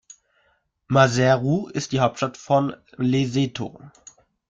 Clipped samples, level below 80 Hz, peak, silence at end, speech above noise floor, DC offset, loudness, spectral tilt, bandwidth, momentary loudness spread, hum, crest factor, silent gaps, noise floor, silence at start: under 0.1%; -58 dBFS; -2 dBFS; 0.6 s; 45 dB; under 0.1%; -22 LUFS; -6 dB/octave; 7.8 kHz; 11 LU; none; 20 dB; none; -66 dBFS; 0.9 s